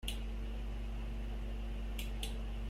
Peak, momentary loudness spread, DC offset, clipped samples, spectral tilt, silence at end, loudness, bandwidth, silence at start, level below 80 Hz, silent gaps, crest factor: -22 dBFS; 2 LU; under 0.1%; under 0.1%; -5 dB/octave; 0 s; -43 LUFS; 15 kHz; 0 s; -40 dBFS; none; 18 dB